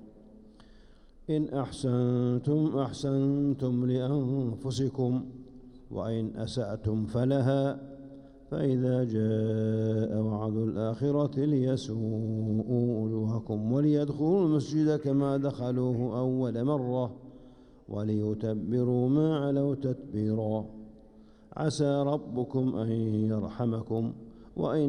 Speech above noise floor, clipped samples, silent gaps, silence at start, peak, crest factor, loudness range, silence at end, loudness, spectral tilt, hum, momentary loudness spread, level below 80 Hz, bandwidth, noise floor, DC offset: 26 dB; under 0.1%; none; 0 s; -16 dBFS; 14 dB; 3 LU; 0 s; -29 LUFS; -8.5 dB/octave; none; 7 LU; -56 dBFS; 10.5 kHz; -55 dBFS; under 0.1%